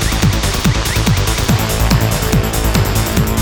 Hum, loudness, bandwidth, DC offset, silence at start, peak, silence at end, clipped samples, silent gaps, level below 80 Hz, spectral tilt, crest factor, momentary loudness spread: none; -14 LUFS; over 20 kHz; under 0.1%; 0 s; 0 dBFS; 0 s; under 0.1%; none; -20 dBFS; -4.5 dB/octave; 14 dB; 1 LU